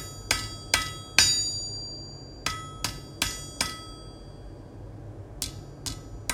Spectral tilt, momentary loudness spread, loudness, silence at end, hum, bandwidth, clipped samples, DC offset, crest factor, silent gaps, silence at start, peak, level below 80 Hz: -1 dB/octave; 23 LU; -28 LUFS; 0 s; none; 17 kHz; under 0.1%; under 0.1%; 32 dB; none; 0 s; 0 dBFS; -46 dBFS